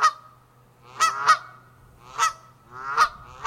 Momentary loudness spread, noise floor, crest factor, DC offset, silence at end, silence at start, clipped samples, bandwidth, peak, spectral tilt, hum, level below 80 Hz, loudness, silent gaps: 18 LU; -55 dBFS; 22 dB; under 0.1%; 0 s; 0 s; under 0.1%; 16.5 kHz; -4 dBFS; 0.5 dB/octave; none; -60 dBFS; -23 LUFS; none